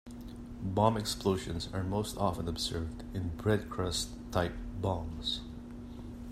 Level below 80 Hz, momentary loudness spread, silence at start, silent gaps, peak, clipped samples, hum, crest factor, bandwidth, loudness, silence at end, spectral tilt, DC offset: -48 dBFS; 16 LU; 0.05 s; none; -10 dBFS; under 0.1%; none; 24 dB; 15.5 kHz; -34 LUFS; 0 s; -5 dB/octave; under 0.1%